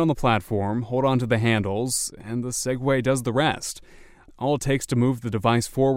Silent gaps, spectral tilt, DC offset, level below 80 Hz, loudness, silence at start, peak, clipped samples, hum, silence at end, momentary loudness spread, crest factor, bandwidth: none; -5 dB/octave; under 0.1%; -46 dBFS; -24 LUFS; 0 s; -6 dBFS; under 0.1%; none; 0 s; 7 LU; 18 dB; 16 kHz